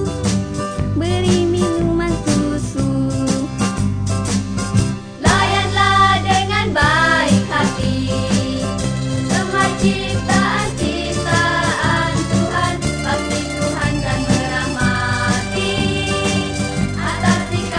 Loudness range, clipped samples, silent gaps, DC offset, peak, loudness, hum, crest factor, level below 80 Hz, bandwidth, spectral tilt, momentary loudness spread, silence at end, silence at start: 4 LU; under 0.1%; none; under 0.1%; -2 dBFS; -17 LUFS; none; 14 dB; -32 dBFS; 10.5 kHz; -5 dB/octave; 7 LU; 0 s; 0 s